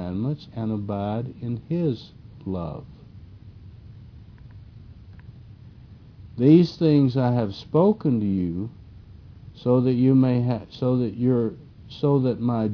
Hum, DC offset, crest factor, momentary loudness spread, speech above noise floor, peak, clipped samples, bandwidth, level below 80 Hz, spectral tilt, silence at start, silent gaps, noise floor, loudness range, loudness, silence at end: none; under 0.1%; 20 dB; 15 LU; 24 dB; -4 dBFS; under 0.1%; 5.4 kHz; -52 dBFS; -10 dB/octave; 0 s; none; -46 dBFS; 13 LU; -23 LUFS; 0 s